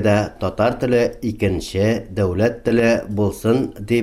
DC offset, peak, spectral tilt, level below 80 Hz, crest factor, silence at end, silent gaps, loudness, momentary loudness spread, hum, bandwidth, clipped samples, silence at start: under 0.1%; -4 dBFS; -6.5 dB/octave; -40 dBFS; 14 dB; 0 s; none; -19 LUFS; 5 LU; none; 15.5 kHz; under 0.1%; 0 s